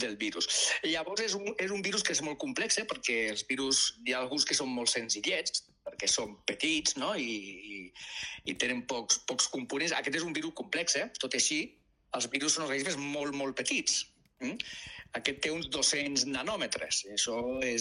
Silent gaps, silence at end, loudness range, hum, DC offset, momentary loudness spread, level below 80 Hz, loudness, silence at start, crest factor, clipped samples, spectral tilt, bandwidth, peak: none; 0 s; 3 LU; none; under 0.1%; 11 LU; -66 dBFS; -31 LUFS; 0 s; 20 dB; under 0.1%; -1 dB/octave; 13 kHz; -12 dBFS